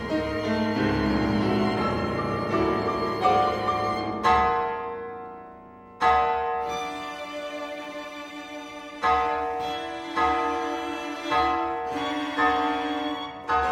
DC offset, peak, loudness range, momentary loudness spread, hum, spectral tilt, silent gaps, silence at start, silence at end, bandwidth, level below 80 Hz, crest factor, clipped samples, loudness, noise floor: under 0.1%; -8 dBFS; 5 LU; 14 LU; none; -5.5 dB/octave; none; 0 s; 0 s; 15.5 kHz; -46 dBFS; 18 dB; under 0.1%; -26 LUFS; -46 dBFS